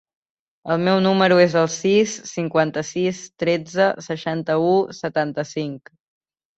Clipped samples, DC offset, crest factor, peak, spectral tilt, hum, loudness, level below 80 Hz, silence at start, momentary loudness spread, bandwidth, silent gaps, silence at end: under 0.1%; under 0.1%; 18 dB; -2 dBFS; -5 dB/octave; none; -20 LUFS; -62 dBFS; 0.65 s; 11 LU; 8.2 kHz; none; 0.8 s